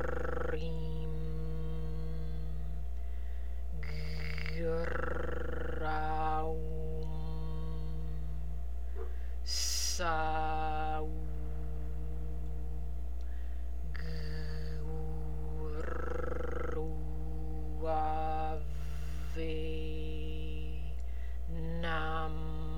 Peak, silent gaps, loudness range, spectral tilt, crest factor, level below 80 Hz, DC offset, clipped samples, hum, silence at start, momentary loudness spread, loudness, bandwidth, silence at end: -20 dBFS; none; 5 LU; -5 dB/octave; 18 dB; -40 dBFS; 2%; under 0.1%; none; 0 s; 8 LU; -39 LUFS; 16 kHz; 0 s